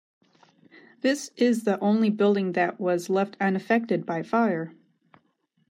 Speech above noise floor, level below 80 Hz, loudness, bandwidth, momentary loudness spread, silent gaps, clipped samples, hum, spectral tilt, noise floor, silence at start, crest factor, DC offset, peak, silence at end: 46 dB; -78 dBFS; -25 LUFS; 15 kHz; 5 LU; none; under 0.1%; none; -6 dB/octave; -70 dBFS; 1.05 s; 16 dB; under 0.1%; -10 dBFS; 1 s